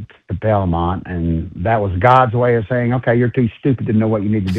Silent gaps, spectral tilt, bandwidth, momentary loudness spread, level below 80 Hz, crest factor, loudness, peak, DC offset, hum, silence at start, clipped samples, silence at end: none; -9.5 dB/octave; 5.4 kHz; 9 LU; -36 dBFS; 16 dB; -16 LUFS; 0 dBFS; under 0.1%; none; 0 s; under 0.1%; 0 s